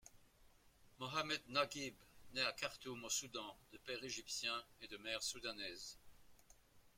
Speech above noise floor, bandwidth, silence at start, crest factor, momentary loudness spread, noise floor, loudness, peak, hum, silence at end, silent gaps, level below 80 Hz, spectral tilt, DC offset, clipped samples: 23 dB; 16.5 kHz; 0.05 s; 24 dB; 12 LU; -69 dBFS; -44 LUFS; -24 dBFS; none; 0.1 s; none; -74 dBFS; -1.5 dB/octave; under 0.1%; under 0.1%